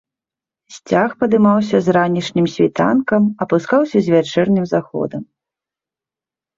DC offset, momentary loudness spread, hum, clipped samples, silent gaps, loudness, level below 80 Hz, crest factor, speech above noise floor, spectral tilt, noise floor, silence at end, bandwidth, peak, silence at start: under 0.1%; 6 LU; none; under 0.1%; none; -16 LUFS; -56 dBFS; 14 dB; 74 dB; -7 dB/octave; -89 dBFS; 1.35 s; 7.6 kHz; -2 dBFS; 0.7 s